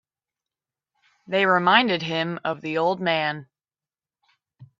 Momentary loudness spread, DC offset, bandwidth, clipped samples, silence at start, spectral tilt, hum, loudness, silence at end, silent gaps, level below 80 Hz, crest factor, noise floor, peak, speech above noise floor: 11 LU; under 0.1%; 7.6 kHz; under 0.1%; 1.3 s; -6 dB/octave; none; -22 LUFS; 0.15 s; none; -72 dBFS; 24 dB; under -90 dBFS; -2 dBFS; over 68 dB